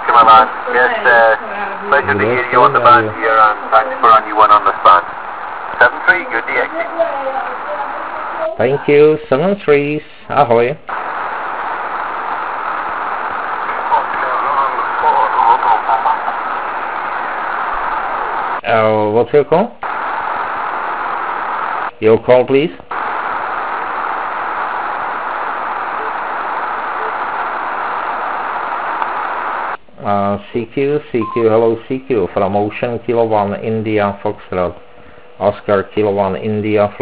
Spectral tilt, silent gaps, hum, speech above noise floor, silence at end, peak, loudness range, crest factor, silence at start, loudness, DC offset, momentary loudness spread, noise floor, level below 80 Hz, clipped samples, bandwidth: -9 dB/octave; none; none; 28 dB; 0 s; 0 dBFS; 8 LU; 14 dB; 0 s; -15 LUFS; 1%; 11 LU; -40 dBFS; -48 dBFS; 0.2%; 4 kHz